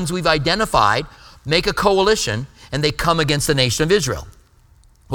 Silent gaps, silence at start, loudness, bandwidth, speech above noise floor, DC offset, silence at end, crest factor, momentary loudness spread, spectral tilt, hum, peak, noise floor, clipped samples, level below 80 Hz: none; 0 s; -18 LUFS; 19 kHz; 33 dB; under 0.1%; 0 s; 18 dB; 11 LU; -4 dB/octave; none; 0 dBFS; -51 dBFS; under 0.1%; -36 dBFS